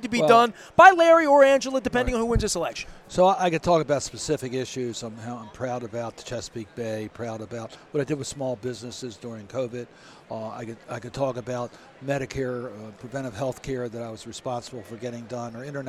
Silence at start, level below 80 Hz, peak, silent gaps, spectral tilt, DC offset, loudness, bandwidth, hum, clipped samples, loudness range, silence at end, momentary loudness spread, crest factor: 0 s; -44 dBFS; -2 dBFS; none; -4.5 dB/octave; under 0.1%; -24 LUFS; 14.5 kHz; none; under 0.1%; 14 LU; 0 s; 19 LU; 22 dB